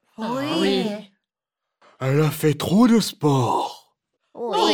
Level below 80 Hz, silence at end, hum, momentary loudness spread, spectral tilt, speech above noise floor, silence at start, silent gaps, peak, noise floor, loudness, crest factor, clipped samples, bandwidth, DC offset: -62 dBFS; 0 s; none; 12 LU; -6 dB/octave; 67 dB; 0.2 s; none; -6 dBFS; -85 dBFS; -21 LUFS; 16 dB; under 0.1%; over 20 kHz; under 0.1%